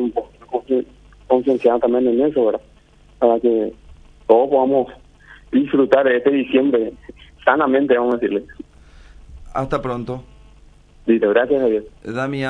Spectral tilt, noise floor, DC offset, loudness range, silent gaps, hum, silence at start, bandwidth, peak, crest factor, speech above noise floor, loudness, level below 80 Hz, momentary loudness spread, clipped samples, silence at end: -7.5 dB/octave; -49 dBFS; under 0.1%; 5 LU; none; none; 0 s; 9.4 kHz; 0 dBFS; 18 dB; 32 dB; -18 LUFS; -46 dBFS; 13 LU; under 0.1%; 0 s